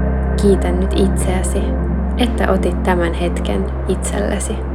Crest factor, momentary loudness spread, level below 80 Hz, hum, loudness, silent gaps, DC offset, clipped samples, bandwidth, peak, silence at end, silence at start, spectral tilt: 16 dB; 5 LU; -20 dBFS; none; -17 LUFS; none; under 0.1%; under 0.1%; 13 kHz; 0 dBFS; 0 s; 0 s; -6 dB/octave